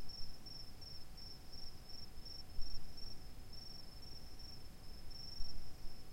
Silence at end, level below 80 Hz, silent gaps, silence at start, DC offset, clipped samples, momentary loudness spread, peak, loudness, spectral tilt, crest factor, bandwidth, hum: 0 s; -52 dBFS; none; 0 s; under 0.1%; under 0.1%; 5 LU; -26 dBFS; -53 LUFS; -4 dB/octave; 16 dB; 16 kHz; none